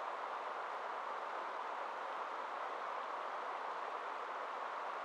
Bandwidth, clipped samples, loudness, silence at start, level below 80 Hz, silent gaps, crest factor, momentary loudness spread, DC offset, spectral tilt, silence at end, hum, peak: 13 kHz; under 0.1%; -43 LUFS; 0 s; under -90 dBFS; none; 14 dB; 1 LU; under 0.1%; -1.5 dB/octave; 0 s; none; -30 dBFS